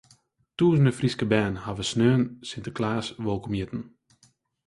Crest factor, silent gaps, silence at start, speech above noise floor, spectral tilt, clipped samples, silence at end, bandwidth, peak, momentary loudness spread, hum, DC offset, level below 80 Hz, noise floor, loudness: 20 dB; none; 0.6 s; 39 dB; -6.5 dB/octave; under 0.1%; 0.8 s; 11.5 kHz; -6 dBFS; 14 LU; none; under 0.1%; -52 dBFS; -64 dBFS; -26 LUFS